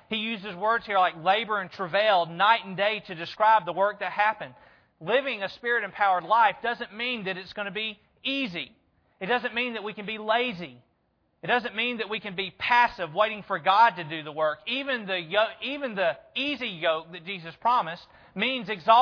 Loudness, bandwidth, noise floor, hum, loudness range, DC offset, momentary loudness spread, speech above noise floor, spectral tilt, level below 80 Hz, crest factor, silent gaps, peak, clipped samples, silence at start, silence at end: -26 LUFS; 5.4 kHz; -71 dBFS; none; 5 LU; under 0.1%; 12 LU; 45 dB; -5.5 dB/octave; -68 dBFS; 20 dB; none; -6 dBFS; under 0.1%; 0.1 s; 0 s